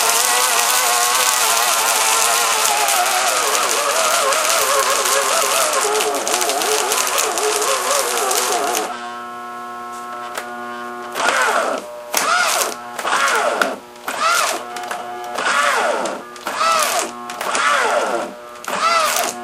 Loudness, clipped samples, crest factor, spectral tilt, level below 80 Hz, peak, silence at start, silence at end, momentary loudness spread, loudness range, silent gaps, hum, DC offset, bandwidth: -16 LUFS; under 0.1%; 18 dB; 1 dB/octave; -64 dBFS; 0 dBFS; 0 s; 0 s; 14 LU; 6 LU; none; none; under 0.1%; 16.5 kHz